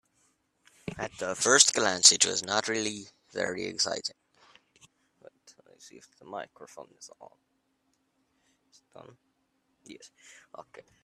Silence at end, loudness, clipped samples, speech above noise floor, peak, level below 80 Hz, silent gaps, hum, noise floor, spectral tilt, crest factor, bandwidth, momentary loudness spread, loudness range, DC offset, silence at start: 0.25 s; -24 LUFS; under 0.1%; 45 dB; -2 dBFS; -70 dBFS; none; none; -75 dBFS; -0.5 dB/octave; 30 dB; 14 kHz; 26 LU; 25 LU; under 0.1%; 0.85 s